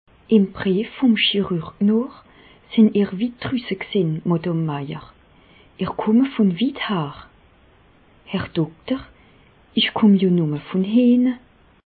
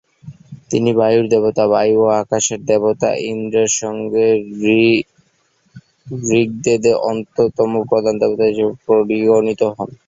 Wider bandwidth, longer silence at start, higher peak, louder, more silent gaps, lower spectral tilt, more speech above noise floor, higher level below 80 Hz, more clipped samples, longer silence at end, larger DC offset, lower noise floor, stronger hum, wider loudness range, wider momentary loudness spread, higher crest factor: second, 4.7 kHz vs 7.8 kHz; about the same, 0.3 s vs 0.25 s; about the same, -4 dBFS vs -2 dBFS; second, -20 LUFS vs -16 LUFS; neither; first, -11.5 dB/octave vs -4.5 dB/octave; second, 34 dB vs 45 dB; about the same, -54 dBFS vs -54 dBFS; neither; first, 0.5 s vs 0.15 s; neither; second, -53 dBFS vs -60 dBFS; neither; first, 5 LU vs 2 LU; first, 12 LU vs 6 LU; about the same, 18 dB vs 14 dB